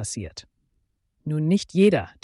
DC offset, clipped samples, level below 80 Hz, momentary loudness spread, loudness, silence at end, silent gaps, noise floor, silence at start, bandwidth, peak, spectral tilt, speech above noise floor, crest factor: under 0.1%; under 0.1%; -54 dBFS; 19 LU; -22 LUFS; 0.15 s; none; -71 dBFS; 0 s; 11.5 kHz; -8 dBFS; -6 dB/octave; 49 dB; 16 dB